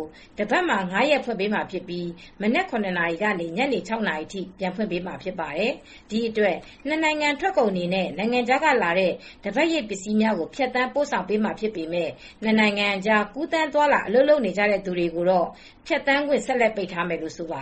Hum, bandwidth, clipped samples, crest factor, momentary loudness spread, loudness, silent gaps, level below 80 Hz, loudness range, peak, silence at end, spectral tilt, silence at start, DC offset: none; 8.4 kHz; under 0.1%; 18 dB; 11 LU; -23 LUFS; none; -56 dBFS; 5 LU; -6 dBFS; 0 s; -5 dB/octave; 0 s; under 0.1%